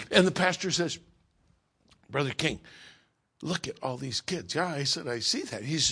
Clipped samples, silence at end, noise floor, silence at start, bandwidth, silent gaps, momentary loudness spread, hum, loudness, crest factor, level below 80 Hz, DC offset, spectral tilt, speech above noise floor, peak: under 0.1%; 0 s; -69 dBFS; 0 s; 10.5 kHz; none; 10 LU; none; -29 LUFS; 24 dB; -62 dBFS; under 0.1%; -3.5 dB/octave; 39 dB; -6 dBFS